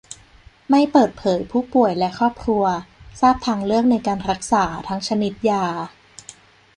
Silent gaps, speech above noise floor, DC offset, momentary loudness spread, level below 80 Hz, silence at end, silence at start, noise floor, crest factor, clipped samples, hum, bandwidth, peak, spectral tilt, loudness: none; 30 dB; under 0.1%; 14 LU; -48 dBFS; 0.85 s; 0.1 s; -49 dBFS; 18 dB; under 0.1%; none; 11 kHz; -2 dBFS; -5.5 dB/octave; -20 LUFS